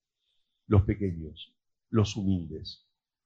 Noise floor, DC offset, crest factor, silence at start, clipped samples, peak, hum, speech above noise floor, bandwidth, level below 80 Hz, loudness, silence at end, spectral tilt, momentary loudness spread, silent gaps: -77 dBFS; under 0.1%; 20 dB; 0.7 s; under 0.1%; -10 dBFS; none; 49 dB; 7.6 kHz; -46 dBFS; -29 LUFS; 0.5 s; -7.5 dB/octave; 21 LU; none